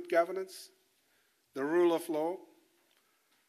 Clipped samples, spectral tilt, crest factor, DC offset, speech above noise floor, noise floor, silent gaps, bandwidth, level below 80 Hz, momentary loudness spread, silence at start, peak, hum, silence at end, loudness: under 0.1%; -5 dB/octave; 18 dB; under 0.1%; 41 dB; -73 dBFS; none; 14.5 kHz; under -90 dBFS; 19 LU; 0 s; -16 dBFS; none; 1.1 s; -32 LUFS